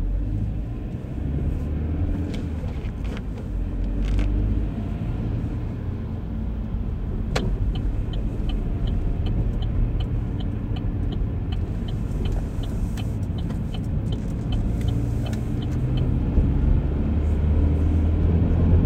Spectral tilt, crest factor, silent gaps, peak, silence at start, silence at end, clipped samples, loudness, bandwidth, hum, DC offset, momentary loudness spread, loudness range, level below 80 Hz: -8.5 dB/octave; 16 dB; none; -8 dBFS; 0 s; 0 s; under 0.1%; -26 LUFS; 8.8 kHz; none; under 0.1%; 8 LU; 5 LU; -26 dBFS